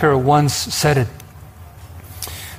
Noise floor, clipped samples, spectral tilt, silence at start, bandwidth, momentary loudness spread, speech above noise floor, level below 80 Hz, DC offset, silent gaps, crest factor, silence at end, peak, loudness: -39 dBFS; under 0.1%; -5 dB/octave; 0 s; 16 kHz; 24 LU; 23 dB; -42 dBFS; under 0.1%; none; 16 dB; 0 s; -4 dBFS; -17 LUFS